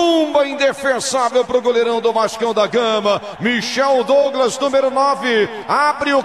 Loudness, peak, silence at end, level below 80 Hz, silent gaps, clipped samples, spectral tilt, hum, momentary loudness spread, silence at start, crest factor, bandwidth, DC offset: -16 LUFS; -2 dBFS; 0 s; -58 dBFS; none; under 0.1%; -3 dB/octave; none; 4 LU; 0 s; 12 dB; 13.5 kHz; 0.2%